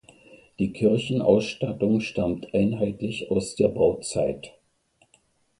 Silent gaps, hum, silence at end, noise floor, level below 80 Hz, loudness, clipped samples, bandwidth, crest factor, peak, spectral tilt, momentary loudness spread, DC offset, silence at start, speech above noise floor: none; none; 1.1 s; -65 dBFS; -52 dBFS; -25 LUFS; under 0.1%; 11.5 kHz; 20 dB; -6 dBFS; -6 dB/octave; 8 LU; under 0.1%; 0.3 s; 42 dB